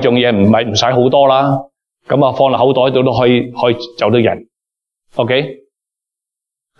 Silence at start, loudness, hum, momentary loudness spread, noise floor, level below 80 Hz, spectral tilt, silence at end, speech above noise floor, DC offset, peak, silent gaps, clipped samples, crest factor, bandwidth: 0 s; -12 LUFS; none; 8 LU; -84 dBFS; -52 dBFS; -6 dB/octave; 1.25 s; 73 dB; under 0.1%; 0 dBFS; none; under 0.1%; 12 dB; 7.2 kHz